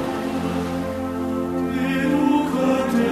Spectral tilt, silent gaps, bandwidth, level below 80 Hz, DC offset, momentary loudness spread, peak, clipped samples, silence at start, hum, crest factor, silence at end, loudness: -6.5 dB/octave; none; 14 kHz; -48 dBFS; under 0.1%; 7 LU; -6 dBFS; under 0.1%; 0 s; none; 14 dB; 0 s; -22 LUFS